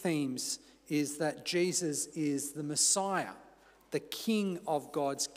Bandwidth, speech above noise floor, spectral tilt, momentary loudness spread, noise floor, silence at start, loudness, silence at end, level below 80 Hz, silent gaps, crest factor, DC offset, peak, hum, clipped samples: 16 kHz; 26 dB; -3 dB/octave; 10 LU; -60 dBFS; 0 s; -33 LUFS; 0 s; -76 dBFS; none; 18 dB; under 0.1%; -16 dBFS; none; under 0.1%